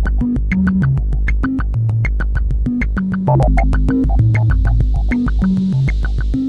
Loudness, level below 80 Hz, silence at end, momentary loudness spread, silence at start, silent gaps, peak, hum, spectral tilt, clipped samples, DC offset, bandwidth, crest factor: -16 LUFS; -16 dBFS; 0 s; 5 LU; 0 s; none; -2 dBFS; none; -9.5 dB/octave; under 0.1%; under 0.1%; 4.8 kHz; 12 dB